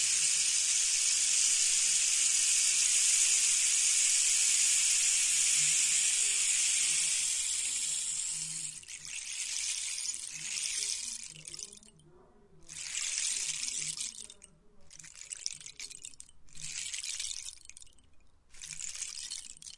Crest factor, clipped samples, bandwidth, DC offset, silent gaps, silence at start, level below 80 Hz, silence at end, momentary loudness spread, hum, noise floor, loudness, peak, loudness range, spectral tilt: 18 dB; under 0.1%; 12 kHz; under 0.1%; none; 0 s; -66 dBFS; 0.05 s; 18 LU; none; -59 dBFS; -27 LUFS; -14 dBFS; 16 LU; 3.5 dB/octave